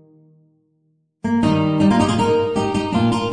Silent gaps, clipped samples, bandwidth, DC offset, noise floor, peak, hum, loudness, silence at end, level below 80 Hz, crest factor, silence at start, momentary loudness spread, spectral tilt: none; under 0.1%; 10 kHz; under 0.1%; -65 dBFS; -4 dBFS; none; -18 LUFS; 0 s; -44 dBFS; 16 dB; 1.25 s; 5 LU; -6.5 dB/octave